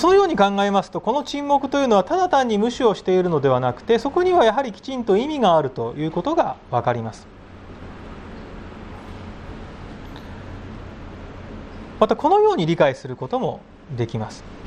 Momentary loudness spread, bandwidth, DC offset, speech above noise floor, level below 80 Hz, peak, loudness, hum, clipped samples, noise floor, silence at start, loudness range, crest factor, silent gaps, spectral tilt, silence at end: 21 LU; 9.8 kHz; under 0.1%; 20 dB; -46 dBFS; -2 dBFS; -20 LUFS; none; under 0.1%; -40 dBFS; 0 s; 18 LU; 20 dB; none; -6 dB/octave; 0 s